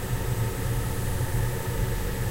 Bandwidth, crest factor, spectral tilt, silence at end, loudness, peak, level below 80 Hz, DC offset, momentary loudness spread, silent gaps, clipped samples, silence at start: 16 kHz; 12 dB; -5.5 dB/octave; 0 s; -29 LUFS; -14 dBFS; -32 dBFS; under 0.1%; 1 LU; none; under 0.1%; 0 s